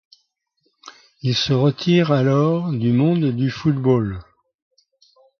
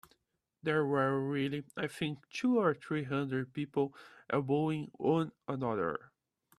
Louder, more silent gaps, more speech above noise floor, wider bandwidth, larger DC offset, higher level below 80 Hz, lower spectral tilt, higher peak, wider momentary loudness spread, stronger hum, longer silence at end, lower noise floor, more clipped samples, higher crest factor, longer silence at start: first, -19 LUFS vs -34 LUFS; neither; first, 52 dB vs 47 dB; second, 6.8 kHz vs 14 kHz; neither; first, -50 dBFS vs -74 dBFS; about the same, -7 dB/octave vs -7 dB/octave; first, -4 dBFS vs -16 dBFS; about the same, 6 LU vs 8 LU; neither; first, 1.15 s vs 0.6 s; second, -69 dBFS vs -81 dBFS; neither; about the same, 16 dB vs 18 dB; first, 0.85 s vs 0.65 s